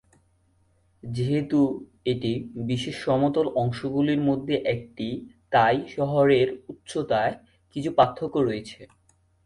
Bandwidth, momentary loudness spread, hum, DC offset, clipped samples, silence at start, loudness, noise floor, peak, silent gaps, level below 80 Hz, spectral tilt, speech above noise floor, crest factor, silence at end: 11.5 kHz; 12 LU; none; under 0.1%; under 0.1%; 1.05 s; -25 LUFS; -65 dBFS; -4 dBFS; none; -56 dBFS; -7 dB/octave; 40 dB; 22 dB; 0.6 s